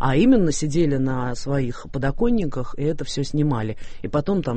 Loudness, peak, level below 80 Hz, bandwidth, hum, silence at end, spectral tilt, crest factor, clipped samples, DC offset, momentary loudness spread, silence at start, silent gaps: -22 LUFS; -6 dBFS; -34 dBFS; 8.8 kHz; none; 0 s; -6.5 dB/octave; 14 dB; under 0.1%; under 0.1%; 10 LU; 0 s; none